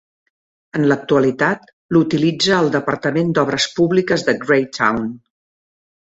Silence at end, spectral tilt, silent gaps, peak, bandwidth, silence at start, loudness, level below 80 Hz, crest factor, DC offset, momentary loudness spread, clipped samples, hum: 0.95 s; -5 dB/octave; 1.73-1.89 s; -2 dBFS; 8.2 kHz; 0.75 s; -17 LUFS; -56 dBFS; 16 dB; under 0.1%; 4 LU; under 0.1%; none